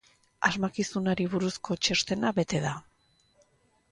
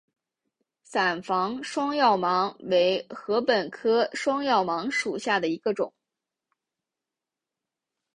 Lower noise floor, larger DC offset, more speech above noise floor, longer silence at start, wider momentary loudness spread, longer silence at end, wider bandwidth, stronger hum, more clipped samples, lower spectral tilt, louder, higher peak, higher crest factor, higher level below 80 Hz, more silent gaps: second, -67 dBFS vs -88 dBFS; neither; second, 39 dB vs 63 dB; second, 0.4 s vs 0.9 s; about the same, 5 LU vs 6 LU; second, 1.1 s vs 2.25 s; about the same, 11 kHz vs 11 kHz; neither; neither; about the same, -4 dB/octave vs -4 dB/octave; second, -29 LUFS vs -25 LUFS; about the same, -10 dBFS vs -8 dBFS; about the same, 22 dB vs 18 dB; first, -60 dBFS vs -72 dBFS; neither